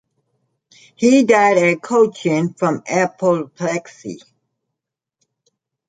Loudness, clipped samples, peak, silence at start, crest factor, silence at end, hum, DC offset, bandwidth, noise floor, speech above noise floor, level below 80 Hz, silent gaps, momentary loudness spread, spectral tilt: -16 LUFS; under 0.1%; -2 dBFS; 1 s; 18 dB; 1.7 s; none; under 0.1%; 9.4 kHz; -83 dBFS; 67 dB; -66 dBFS; none; 18 LU; -5.5 dB/octave